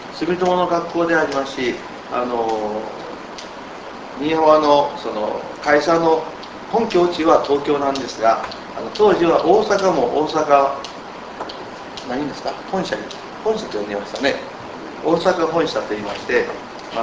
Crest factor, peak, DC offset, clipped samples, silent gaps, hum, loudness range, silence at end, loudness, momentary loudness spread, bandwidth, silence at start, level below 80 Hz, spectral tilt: 20 dB; 0 dBFS; under 0.1%; under 0.1%; none; none; 7 LU; 0 s; -19 LUFS; 16 LU; 8 kHz; 0 s; -52 dBFS; -5 dB/octave